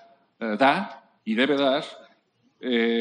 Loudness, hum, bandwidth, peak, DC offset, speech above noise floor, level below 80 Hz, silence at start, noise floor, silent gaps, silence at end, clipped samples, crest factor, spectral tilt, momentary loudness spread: -24 LUFS; none; 10 kHz; -6 dBFS; under 0.1%; 42 dB; -78 dBFS; 0.4 s; -65 dBFS; none; 0 s; under 0.1%; 18 dB; -5.5 dB/octave; 16 LU